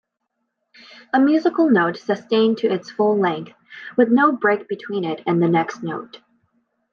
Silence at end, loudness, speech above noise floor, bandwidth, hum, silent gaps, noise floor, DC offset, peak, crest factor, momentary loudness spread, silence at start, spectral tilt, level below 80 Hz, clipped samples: 0.75 s; -19 LUFS; 57 dB; 7 kHz; none; none; -76 dBFS; under 0.1%; -4 dBFS; 16 dB; 13 LU; 1.15 s; -7 dB/octave; -74 dBFS; under 0.1%